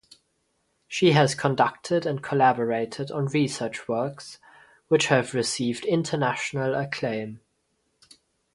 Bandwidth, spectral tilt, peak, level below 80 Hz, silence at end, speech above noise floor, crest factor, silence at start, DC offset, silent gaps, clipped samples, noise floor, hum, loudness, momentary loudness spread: 11.5 kHz; -5 dB/octave; -4 dBFS; -66 dBFS; 1.2 s; 48 dB; 22 dB; 0.9 s; under 0.1%; none; under 0.1%; -72 dBFS; none; -25 LUFS; 10 LU